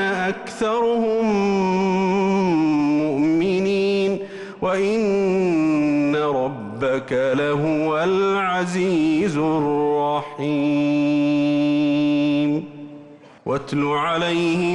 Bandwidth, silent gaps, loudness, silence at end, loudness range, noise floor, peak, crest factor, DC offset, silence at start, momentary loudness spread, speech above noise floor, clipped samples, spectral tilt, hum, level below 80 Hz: 10.5 kHz; none; -20 LUFS; 0 s; 2 LU; -43 dBFS; -12 dBFS; 8 dB; under 0.1%; 0 s; 6 LU; 24 dB; under 0.1%; -6.5 dB/octave; none; -56 dBFS